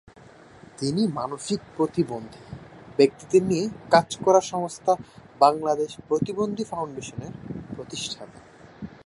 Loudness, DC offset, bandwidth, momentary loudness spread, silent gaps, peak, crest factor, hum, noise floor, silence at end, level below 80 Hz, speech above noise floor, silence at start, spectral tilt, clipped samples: -24 LUFS; under 0.1%; 11.5 kHz; 17 LU; none; -2 dBFS; 22 dB; none; -49 dBFS; 0.15 s; -58 dBFS; 25 dB; 0.8 s; -5 dB/octave; under 0.1%